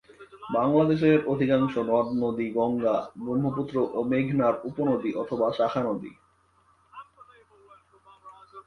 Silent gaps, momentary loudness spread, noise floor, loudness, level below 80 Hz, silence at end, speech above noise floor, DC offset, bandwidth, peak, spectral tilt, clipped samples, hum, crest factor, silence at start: none; 8 LU; -64 dBFS; -26 LUFS; -62 dBFS; 0.05 s; 39 dB; under 0.1%; 6.4 kHz; -8 dBFS; -9 dB/octave; under 0.1%; none; 18 dB; 0.2 s